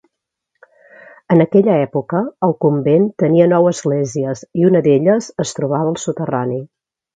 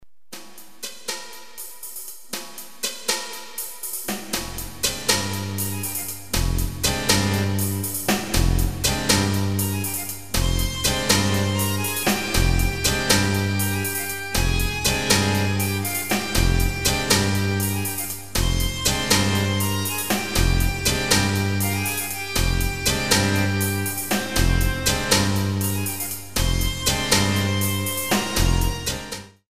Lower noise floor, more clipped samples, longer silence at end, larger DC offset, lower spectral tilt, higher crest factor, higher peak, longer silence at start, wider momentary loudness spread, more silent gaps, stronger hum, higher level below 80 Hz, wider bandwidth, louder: first, -74 dBFS vs -44 dBFS; neither; first, 0.5 s vs 0 s; second, under 0.1% vs 1%; first, -7 dB/octave vs -3.5 dB/octave; about the same, 16 dB vs 20 dB; about the same, 0 dBFS vs -2 dBFS; first, 1.3 s vs 0 s; second, 9 LU vs 12 LU; neither; neither; second, -60 dBFS vs -30 dBFS; second, 9.2 kHz vs 16 kHz; first, -15 LUFS vs -22 LUFS